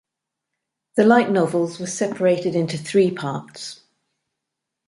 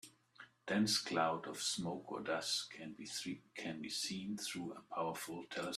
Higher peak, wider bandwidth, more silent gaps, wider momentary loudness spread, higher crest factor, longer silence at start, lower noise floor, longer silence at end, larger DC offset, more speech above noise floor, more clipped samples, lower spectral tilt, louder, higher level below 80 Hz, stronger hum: first, -2 dBFS vs -22 dBFS; second, 11.5 kHz vs 15 kHz; neither; about the same, 15 LU vs 13 LU; about the same, 20 dB vs 20 dB; first, 0.95 s vs 0.05 s; first, -82 dBFS vs -63 dBFS; first, 1.15 s vs 0 s; neither; first, 63 dB vs 21 dB; neither; first, -5.5 dB/octave vs -3 dB/octave; first, -20 LUFS vs -40 LUFS; first, -66 dBFS vs -80 dBFS; neither